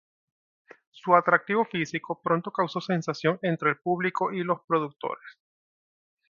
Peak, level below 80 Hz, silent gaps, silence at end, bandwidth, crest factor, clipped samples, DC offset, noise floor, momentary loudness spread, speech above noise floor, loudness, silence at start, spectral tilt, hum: -4 dBFS; -74 dBFS; 4.64-4.68 s; 1 s; 7.4 kHz; 24 dB; under 0.1%; under 0.1%; under -90 dBFS; 10 LU; over 64 dB; -26 LUFS; 0.95 s; -6.5 dB/octave; none